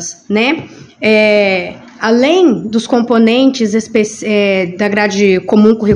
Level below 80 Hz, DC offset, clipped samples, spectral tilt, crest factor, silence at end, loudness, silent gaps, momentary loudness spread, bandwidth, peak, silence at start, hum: -56 dBFS; under 0.1%; 0.4%; -5 dB/octave; 12 dB; 0 s; -11 LUFS; none; 8 LU; 10.5 kHz; 0 dBFS; 0 s; none